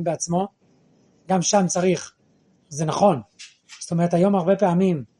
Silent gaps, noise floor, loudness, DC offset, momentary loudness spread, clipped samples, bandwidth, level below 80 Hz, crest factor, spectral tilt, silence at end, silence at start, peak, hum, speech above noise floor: none; -61 dBFS; -21 LUFS; under 0.1%; 17 LU; under 0.1%; 11 kHz; -64 dBFS; 18 dB; -5.5 dB/octave; 0.15 s; 0 s; -4 dBFS; none; 40 dB